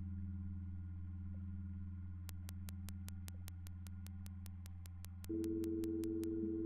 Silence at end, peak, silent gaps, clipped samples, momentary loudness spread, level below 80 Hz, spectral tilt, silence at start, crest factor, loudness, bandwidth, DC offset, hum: 0 s; -24 dBFS; none; under 0.1%; 10 LU; -58 dBFS; -7.5 dB/octave; 0 s; 22 dB; -47 LUFS; 16.5 kHz; under 0.1%; none